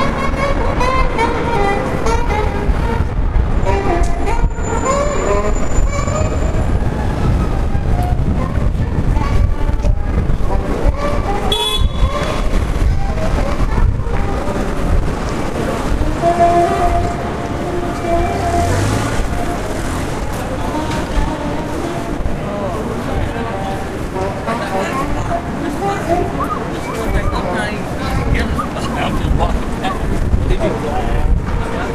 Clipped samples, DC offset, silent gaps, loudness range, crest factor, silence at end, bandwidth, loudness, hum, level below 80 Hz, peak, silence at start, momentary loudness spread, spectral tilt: under 0.1%; under 0.1%; none; 4 LU; 16 dB; 0 s; 14 kHz; -18 LUFS; none; -18 dBFS; 0 dBFS; 0 s; 5 LU; -6 dB/octave